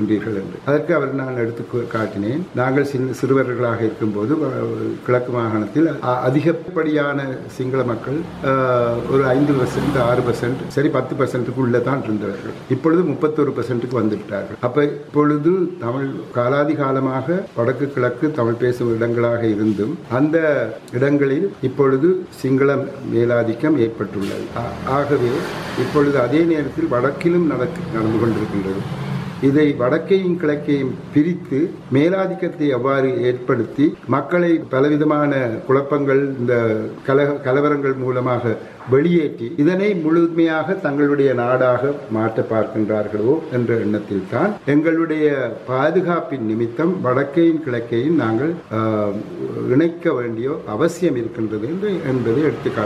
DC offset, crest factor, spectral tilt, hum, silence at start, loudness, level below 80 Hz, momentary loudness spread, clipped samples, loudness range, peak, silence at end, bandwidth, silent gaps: under 0.1%; 16 dB; -8 dB/octave; none; 0 s; -19 LUFS; -52 dBFS; 7 LU; under 0.1%; 2 LU; -2 dBFS; 0 s; 12.5 kHz; none